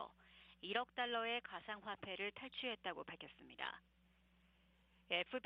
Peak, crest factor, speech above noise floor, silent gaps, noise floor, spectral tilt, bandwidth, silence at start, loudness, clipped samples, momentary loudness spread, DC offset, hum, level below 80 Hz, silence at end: -24 dBFS; 24 dB; 28 dB; none; -74 dBFS; 0 dB/octave; 5.6 kHz; 0 s; -45 LUFS; under 0.1%; 14 LU; under 0.1%; none; -78 dBFS; 0.05 s